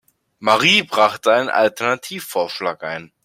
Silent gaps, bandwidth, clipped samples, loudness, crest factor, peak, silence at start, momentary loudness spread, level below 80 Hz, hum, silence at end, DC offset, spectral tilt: none; 16.5 kHz; under 0.1%; -17 LUFS; 18 dB; 0 dBFS; 0.4 s; 11 LU; -62 dBFS; none; 0.2 s; under 0.1%; -3 dB/octave